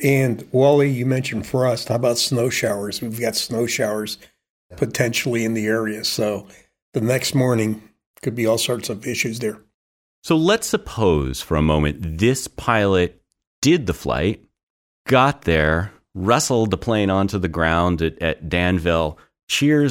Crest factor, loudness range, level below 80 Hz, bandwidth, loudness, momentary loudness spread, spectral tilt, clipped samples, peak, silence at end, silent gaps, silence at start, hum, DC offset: 18 dB; 3 LU; -38 dBFS; 17 kHz; -20 LUFS; 9 LU; -5 dB/octave; under 0.1%; -2 dBFS; 0 s; 4.50-4.70 s, 6.82-6.93 s, 8.06-8.14 s, 9.74-10.22 s, 13.47-13.62 s, 14.63-15.05 s, 19.43-19.48 s; 0 s; none; under 0.1%